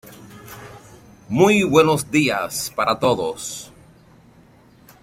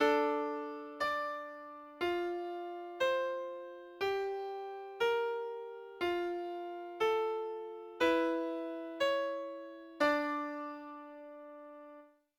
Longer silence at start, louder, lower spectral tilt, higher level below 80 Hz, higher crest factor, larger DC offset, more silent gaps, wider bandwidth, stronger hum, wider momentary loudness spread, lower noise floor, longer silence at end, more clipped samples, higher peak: about the same, 0.05 s vs 0 s; first, -19 LUFS vs -36 LUFS; about the same, -4.5 dB/octave vs -3.5 dB/octave; first, -54 dBFS vs -74 dBFS; about the same, 20 dB vs 18 dB; neither; neither; second, 16.5 kHz vs 18.5 kHz; neither; first, 24 LU vs 17 LU; second, -50 dBFS vs -58 dBFS; first, 1.35 s vs 0.3 s; neither; first, -2 dBFS vs -18 dBFS